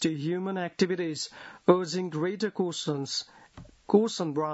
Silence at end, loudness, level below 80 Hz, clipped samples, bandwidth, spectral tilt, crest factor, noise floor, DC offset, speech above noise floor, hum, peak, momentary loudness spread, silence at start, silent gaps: 0 s; -29 LUFS; -66 dBFS; under 0.1%; 8 kHz; -5 dB/octave; 22 dB; -50 dBFS; under 0.1%; 22 dB; none; -6 dBFS; 8 LU; 0 s; none